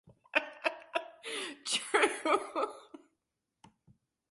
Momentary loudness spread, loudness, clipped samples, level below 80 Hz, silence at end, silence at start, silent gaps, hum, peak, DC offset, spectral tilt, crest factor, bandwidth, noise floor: 10 LU; -33 LUFS; under 0.1%; -82 dBFS; 1.35 s; 0.05 s; none; none; -12 dBFS; under 0.1%; -0.5 dB/octave; 24 dB; 11.5 kHz; -85 dBFS